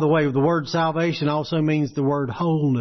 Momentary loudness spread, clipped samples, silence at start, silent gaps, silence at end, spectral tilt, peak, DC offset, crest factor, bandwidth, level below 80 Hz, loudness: 4 LU; under 0.1%; 0 s; none; 0 s; -7.5 dB/octave; -8 dBFS; under 0.1%; 12 dB; 6.4 kHz; -56 dBFS; -22 LUFS